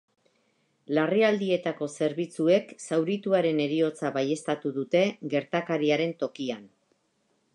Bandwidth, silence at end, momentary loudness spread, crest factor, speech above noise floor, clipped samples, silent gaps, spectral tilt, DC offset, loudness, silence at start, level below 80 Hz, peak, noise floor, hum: 11 kHz; 0.9 s; 7 LU; 18 dB; 45 dB; under 0.1%; none; -5.5 dB/octave; under 0.1%; -27 LUFS; 0.9 s; -82 dBFS; -10 dBFS; -72 dBFS; none